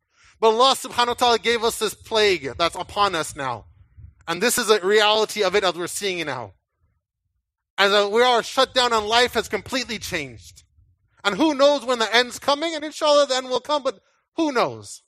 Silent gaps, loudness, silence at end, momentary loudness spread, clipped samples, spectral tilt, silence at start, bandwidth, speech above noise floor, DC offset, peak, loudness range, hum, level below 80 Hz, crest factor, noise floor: 7.70-7.77 s, 14.28-14.32 s; -20 LUFS; 0.1 s; 11 LU; under 0.1%; -2.5 dB/octave; 0.4 s; 15.5 kHz; 56 dB; under 0.1%; 0 dBFS; 2 LU; none; -54 dBFS; 22 dB; -77 dBFS